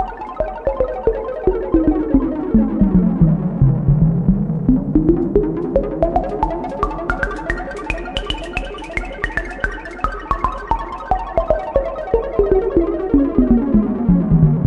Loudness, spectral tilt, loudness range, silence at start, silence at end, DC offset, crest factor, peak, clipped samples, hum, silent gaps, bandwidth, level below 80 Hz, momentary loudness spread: -18 LUFS; -9 dB/octave; 7 LU; 0 s; 0 s; under 0.1%; 16 dB; 0 dBFS; under 0.1%; none; none; 9.6 kHz; -26 dBFS; 10 LU